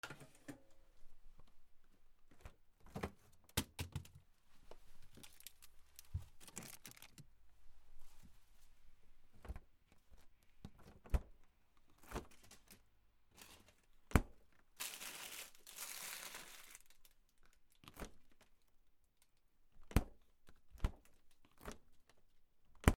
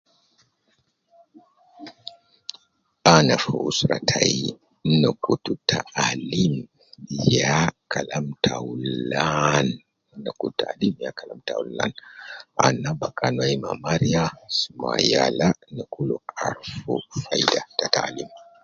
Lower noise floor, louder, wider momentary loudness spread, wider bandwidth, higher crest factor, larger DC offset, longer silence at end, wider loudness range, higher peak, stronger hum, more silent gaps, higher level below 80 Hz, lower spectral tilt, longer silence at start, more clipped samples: first, -73 dBFS vs -68 dBFS; second, -47 LUFS vs -23 LUFS; first, 24 LU vs 17 LU; first, over 20 kHz vs 7.6 kHz; first, 38 dB vs 24 dB; neither; second, 0 s vs 0.2 s; first, 15 LU vs 5 LU; second, -12 dBFS vs 0 dBFS; neither; neither; about the same, -52 dBFS vs -52 dBFS; about the same, -4.5 dB/octave vs -4.5 dB/octave; second, 0.05 s vs 1.8 s; neither